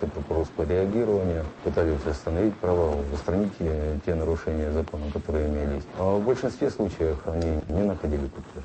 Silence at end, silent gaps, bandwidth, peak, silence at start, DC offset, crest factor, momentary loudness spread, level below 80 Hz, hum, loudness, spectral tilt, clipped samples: 0 s; none; 8.6 kHz; -10 dBFS; 0 s; under 0.1%; 16 dB; 5 LU; -36 dBFS; none; -27 LUFS; -8 dB/octave; under 0.1%